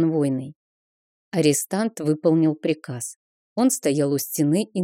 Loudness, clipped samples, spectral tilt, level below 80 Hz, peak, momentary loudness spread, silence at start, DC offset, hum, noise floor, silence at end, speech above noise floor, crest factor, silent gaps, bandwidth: -22 LUFS; under 0.1%; -5.5 dB/octave; -74 dBFS; -6 dBFS; 12 LU; 0 s; under 0.1%; none; under -90 dBFS; 0 s; over 69 dB; 16 dB; 0.56-1.31 s, 3.16-3.56 s; 17 kHz